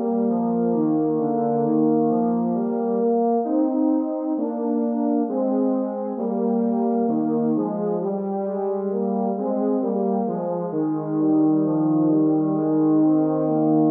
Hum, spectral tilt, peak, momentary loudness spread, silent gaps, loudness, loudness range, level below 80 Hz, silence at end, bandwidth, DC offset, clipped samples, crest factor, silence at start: none; -14.5 dB/octave; -10 dBFS; 6 LU; none; -22 LUFS; 3 LU; -84 dBFS; 0 s; 1.9 kHz; under 0.1%; under 0.1%; 12 dB; 0 s